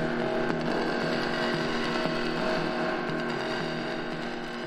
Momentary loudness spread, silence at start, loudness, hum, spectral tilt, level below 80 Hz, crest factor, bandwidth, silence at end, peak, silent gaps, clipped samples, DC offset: 4 LU; 0 s; -29 LUFS; none; -5.5 dB/octave; -50 dBFS; 20 dB; 13.5 kHz; 0 s; -8 dBFS; none; under 0.1%; under 0.1%